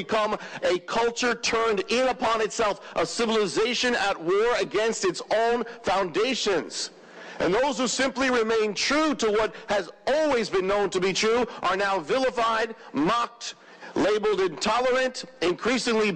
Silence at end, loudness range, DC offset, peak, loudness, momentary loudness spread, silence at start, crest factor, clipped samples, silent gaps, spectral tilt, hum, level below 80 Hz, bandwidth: 0 s; 2 LU; under 0.1%; -14 dBFS; -25 LUFS; 5 LU; 0 s; 10 dB; under 0.1%; none; -3 dB/octave; none; -56 dBFS; 10 kHz